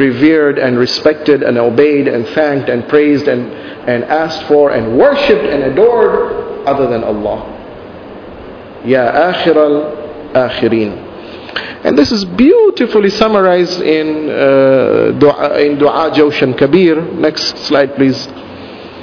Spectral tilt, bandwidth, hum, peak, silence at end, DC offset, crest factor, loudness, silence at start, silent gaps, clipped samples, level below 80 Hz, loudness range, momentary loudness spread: -6 dB/octave; 5.4 kHz; none; 0 dBFS; 0 s; under 0.1%; 10 dB; -11 LUFS; 0 s; none; 0.4%; -44 dBFS; 4 LU; 16 LU